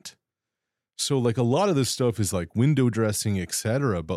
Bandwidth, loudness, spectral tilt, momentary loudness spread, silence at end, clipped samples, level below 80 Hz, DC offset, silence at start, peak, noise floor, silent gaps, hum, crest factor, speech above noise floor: 16 kHz; -24 LUFS; -5.5 dB/octave; 5 LU; 0 s; under 0.1%; -60 dBFS; under 0.1%; 0.05 s; -10 dBFS; -86 dBFS; none; none; 14 dB; 63 dB